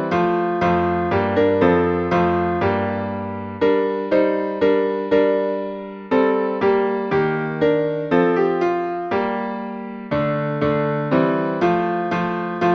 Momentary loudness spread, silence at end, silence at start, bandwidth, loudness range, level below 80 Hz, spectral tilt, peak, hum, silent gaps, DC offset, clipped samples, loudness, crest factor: 7 LU; 0 s; 0 s; 6.4 kHz; 2 LU; -50 dBFS; -8.5 dB/octave; -2 dBFS; none; none; under 0.1%; under 0.1%; -20 LUFS; 16 dB